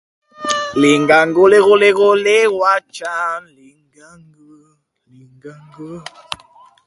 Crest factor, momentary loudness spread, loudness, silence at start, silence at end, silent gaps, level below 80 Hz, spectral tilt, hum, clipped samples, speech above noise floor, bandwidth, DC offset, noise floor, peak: 16 dB; 22 LU; -13 LUFS; 0.4 s; 0.5 s; none; -58 dBFS; -4 dB/octave; none; under 0.1%; 43 dB; 11.5 kHz; under 0.1%; -57 dBFS; 0 dBFS